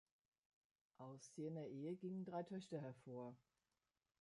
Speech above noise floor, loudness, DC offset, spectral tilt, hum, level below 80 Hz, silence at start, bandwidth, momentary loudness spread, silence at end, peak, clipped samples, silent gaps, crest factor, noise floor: over 39 dB; -53 LUFS; under 0.1%; -7 dB/octave; none; under -90 dBFS; 1 s; 11 kHz; 9 LU; 0.85 s; -38 dBFS; under 0.1%; none; 16 dB; under -90 dBFS